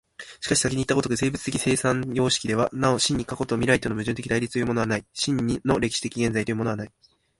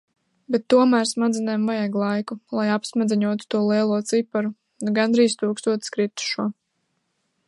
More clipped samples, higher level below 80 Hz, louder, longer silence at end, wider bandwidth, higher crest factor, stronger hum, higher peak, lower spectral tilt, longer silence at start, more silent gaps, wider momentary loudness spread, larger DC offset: neither; first, -50 dBFS vs -72 dBFS; about the same, -24 LUFS vs -22 LUFS; second, 0.5 s vs 0.95 s; about the same, 11.5 kHz vs 11.5 kHz; about the same, 22 dB vs 18 dB; neither; about the same, -4 dBFS vs -4 dBFS; about the same, -4.5 dB/octave vs -5 dB/octave; second, 0.2 s vs 0.5 s; neither; about the same, 6 LU vs 8 LU; neither